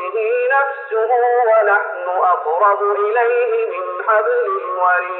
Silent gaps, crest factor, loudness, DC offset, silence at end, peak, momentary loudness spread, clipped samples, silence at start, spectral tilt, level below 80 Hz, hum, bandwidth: none; 12 dB; -16 LUFS; under 0.1%; 0 s; -4 dBFS; 7 LU; under 0.1%; 0 s; 2.5 dB/octave; -88 dBFS; none; 4 kHz